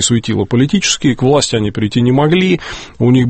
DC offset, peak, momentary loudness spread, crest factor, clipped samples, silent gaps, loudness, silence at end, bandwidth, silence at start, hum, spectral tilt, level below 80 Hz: under 0.1%; 0 dBFS; 5 LU; 12 dB; under 0.1%; none; -13 LUFS; 0 s; 8.8 kHz; 0 s; none; -5 dB/octave; -40 dBFS